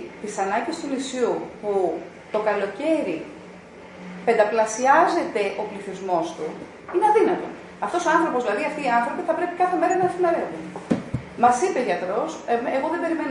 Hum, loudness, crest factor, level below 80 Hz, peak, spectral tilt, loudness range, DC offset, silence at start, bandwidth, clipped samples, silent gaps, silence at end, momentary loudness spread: none; -23 LUFS; 20 dB; -60 dBFS; -4 dBFS; -5 dB/octave; 3 LU; under 0.1%; 0 s; 11 kHz; under 0.1%; none; 0 s; 14 LU